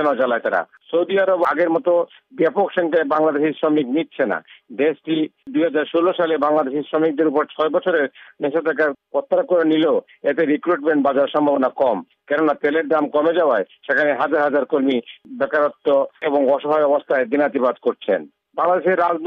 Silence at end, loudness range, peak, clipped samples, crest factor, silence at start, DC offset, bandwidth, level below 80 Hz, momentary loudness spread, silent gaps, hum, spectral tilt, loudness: 0 s; 2 LU; -6 dBFS; under 0.1%; 12 dB; 0 s; under 0.1%; 5.4 kHz; -70 dBFS; 6 LU; none; none; -7.5 dB/octave; -19 LUFS